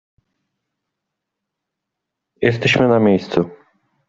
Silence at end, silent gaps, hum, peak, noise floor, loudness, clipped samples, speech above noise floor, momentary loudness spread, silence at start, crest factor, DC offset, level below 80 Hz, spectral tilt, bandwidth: 0.55 s; none; none; -2 dBFS; -81 dBFS; -16 LUFS; under 0.1%; 65 dB; 8 LU; 2.4 s; 20 dB; under 0.1%; -56 dBFS; -6.5 dB/octave; 7.8 kHz